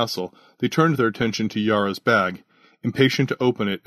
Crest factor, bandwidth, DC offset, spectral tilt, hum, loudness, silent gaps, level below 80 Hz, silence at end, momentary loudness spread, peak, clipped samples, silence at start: 18 dB; 13.5 kHz; under 0.1%; -5.5 dB/octave; none; -21 LUFS; none; -60 dBFS; 0.1 s; 10 LU; -4 dBFS; under 0.1%; 0 s